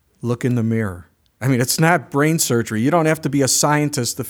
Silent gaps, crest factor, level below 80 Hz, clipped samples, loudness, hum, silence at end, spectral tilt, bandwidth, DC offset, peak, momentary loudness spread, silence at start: none; 18 dB; -56 dBFS; under 0.1%; -18 LUFS; none; 0 s; -4.5 dB/octave; over 20 kHz; under 0.1%; 0 dBFS; 8 LU; 0.25 s